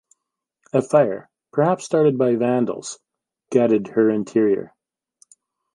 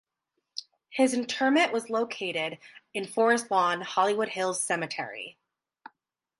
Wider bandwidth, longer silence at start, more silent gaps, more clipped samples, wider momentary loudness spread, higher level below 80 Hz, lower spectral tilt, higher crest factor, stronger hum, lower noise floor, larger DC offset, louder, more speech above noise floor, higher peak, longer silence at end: about the same, 11.5 kHz vs 11.5 kHz; first, 0.75 s vs 0.55 s; neither; neither; second, 10 LU vs 17 LU; first, -70 dBFS vs -82 dBFS; first, -7 dB/octave vs -3 dB/octave; about the same, 18 dB vs 18 dB; neither; about the same, -80 dBFS vs -82 dBFS; neither; first, -20 LUFS vs -27 LUFS; first, 61 dB vs 54 dB; first, -2 dBFS vs -10 dBFS; about the same, 1.1 s vs 1.1 s